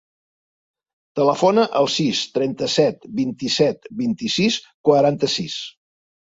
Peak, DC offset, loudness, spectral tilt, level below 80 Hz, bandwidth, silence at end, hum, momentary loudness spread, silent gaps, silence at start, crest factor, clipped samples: -2 dBFS; under 0.1%; -19 LUFS; -4.5 dB/octave; -62 dBFS; 8 kHz; 0.6 s; none; 9 LU; 4.74-4.84 s; 1.15 s; 18 dB; under 0.1%